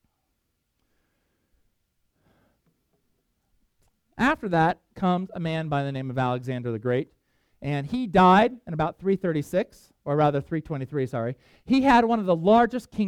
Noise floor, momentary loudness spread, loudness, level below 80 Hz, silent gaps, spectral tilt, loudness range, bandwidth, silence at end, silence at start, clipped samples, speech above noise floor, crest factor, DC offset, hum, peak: -76 dBFS; 12 LU; -24 LUFS; -54 dBFS; none; -7.5 dB/octave; 5 LU; 14 kHz; 0 s; 4.15 s; under 0.1%; 52 dB; 20 dB; under 0.1%; none; -6 dBFS